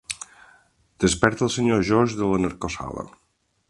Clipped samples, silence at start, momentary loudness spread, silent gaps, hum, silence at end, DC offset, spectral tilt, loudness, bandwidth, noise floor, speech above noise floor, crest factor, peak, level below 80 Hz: under 0.1%; 0.1 s; 15 LU; none; none; 0.6 s; under 0.1%; -5 dB/octave; -23 LUFS; 11.5 kHz; -58 dBFS; 36 dB; 24 dB; 0 dBFS; -46 dBFS